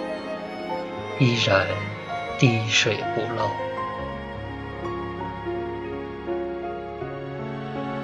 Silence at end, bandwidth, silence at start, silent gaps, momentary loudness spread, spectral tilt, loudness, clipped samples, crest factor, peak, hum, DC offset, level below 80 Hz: 0 s; 9.4 kHz; 0 s; none; 13 LU; -5 dB/octave; -26 LUFS; under 0.1%; 24 dB; -2 dBFS; none; under 0.1%; -48 dBFS